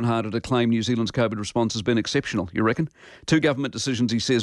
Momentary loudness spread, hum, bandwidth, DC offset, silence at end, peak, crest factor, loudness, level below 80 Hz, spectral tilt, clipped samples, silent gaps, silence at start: 5 LU; none; 11.5 kHz; under 0.1%; 0 s; -8 dBFS; 16 dB; -24 LUFS; -52 dBFS; -5.5 dB/octave; under 0.1%; none; 0 s